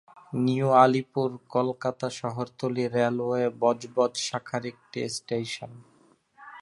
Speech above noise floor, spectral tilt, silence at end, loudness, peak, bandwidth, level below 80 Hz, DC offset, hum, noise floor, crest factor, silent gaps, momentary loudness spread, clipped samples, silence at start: 35 dB; -5.5 dB/octave; 0 s; -27 LUFS; -6 dBFS; 11.5 kHz; -70 dBFS; under 0.1%; none; -62 dBFS; 22 dB; none; 14 LU; under 0.1%; 0.3 s